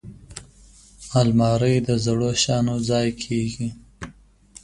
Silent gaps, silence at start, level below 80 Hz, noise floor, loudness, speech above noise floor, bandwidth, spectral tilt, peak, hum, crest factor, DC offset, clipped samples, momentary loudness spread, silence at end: none; 0.05 s; -46 dBFS; -50 dBFS; -21 LUFS; 29 dB; 11.5 kHz; -5.5 dB/octave; -4 dBFS; none; 18 dB; under 0.1%; under 0.1%; 21 LU; 0.5 s